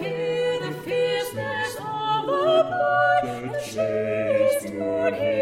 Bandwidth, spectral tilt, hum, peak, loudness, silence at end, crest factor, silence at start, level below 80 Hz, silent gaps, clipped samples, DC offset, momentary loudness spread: 16 kHz; -4.5 dB/octave; none; -8 dBFS; -24 LUFS; 0 s; 14 dB; 0 s; -60 dBFS; none; under 0.1%; under 0.1%; 8 LU